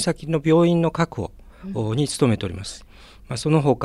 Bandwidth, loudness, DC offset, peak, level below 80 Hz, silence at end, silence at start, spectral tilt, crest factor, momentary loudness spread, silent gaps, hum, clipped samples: 12.5 kHz; -22 LUFS; under 0.1%; -6 dBFS; -46 dBFS; 0 s; 0 s; -6 dB/octave; 16 dB; 17 LU; none; none; under 0.1%